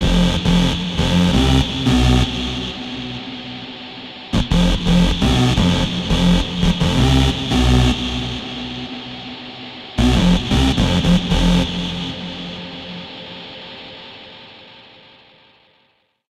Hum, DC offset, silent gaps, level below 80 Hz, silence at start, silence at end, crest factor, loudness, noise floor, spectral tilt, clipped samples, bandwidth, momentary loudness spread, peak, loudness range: none; under 0.1%; none; -24 dBFS; 0 s; 1.6 s; 14 dB; -17 LUFS; -61 dBFS; -5.5 dB/octave; under 0.1%; 13.5 kHz; 17 LU; -4 dBFS; 14 LU